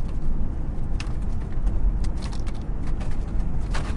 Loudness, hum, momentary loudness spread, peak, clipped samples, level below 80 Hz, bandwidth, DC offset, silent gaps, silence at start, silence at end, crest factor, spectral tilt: -30 LUFS; none; 4 LU; -12 dBFS; under 0.1%; -24 dBFS; 10 kHz; under 0.1%; none; 0 s; 0 s; 12 dB; -6.5 dB/octave